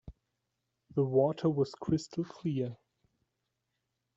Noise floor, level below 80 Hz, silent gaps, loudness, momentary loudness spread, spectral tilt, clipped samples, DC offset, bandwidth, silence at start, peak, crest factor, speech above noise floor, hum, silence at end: -84 dBFS; -64 dBFS; none; -32 LUFS; 10 LU; -8 dB/octave; under 0.1%; under 0.1%; 8 kHz; 0.05 s; -14 dBFS; 20 dB; 53 dB; none; 1.4 s